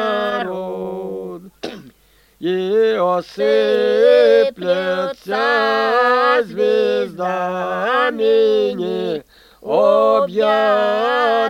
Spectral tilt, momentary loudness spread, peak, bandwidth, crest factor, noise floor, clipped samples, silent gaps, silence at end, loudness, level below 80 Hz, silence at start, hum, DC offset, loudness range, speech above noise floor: -5.5 dB/octave; 13 LU; -2 dBFS; 15.5 kHz; 14 dB; -54 dBFS; under 0.1%; none; 0 s; -16 LUFS; -58 dBFS; 0 s; none; under 0.1%; 5 LU; 38 dB